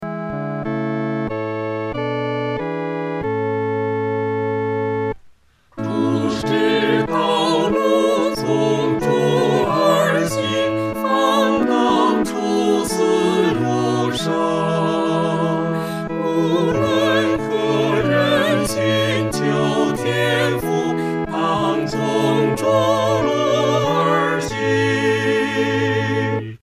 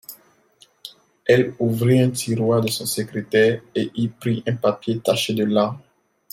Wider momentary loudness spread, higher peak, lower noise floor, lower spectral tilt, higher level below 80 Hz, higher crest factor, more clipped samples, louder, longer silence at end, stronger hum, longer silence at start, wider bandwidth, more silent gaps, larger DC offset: second, 7 LU vs 18 LU; about the same, -4 dBFS vs -4 dBFS; second, -51 dBFS vs -56 dBFS; about the same, -5.5 dB/octave vs -5.5 dB/octave; first, -48 dBFS vs -60 dBFS; about the same, 14 dB vs 18 dB; neither; first, -18 LUFS vs -21 LUFS; second, 0.05 s vs 0.55 s; neither; about the same, 0 s vs 0.1 s; about the same, 15.5 kHz vs 16.5 kHz; neither; first, 0.2% vs under 0.1%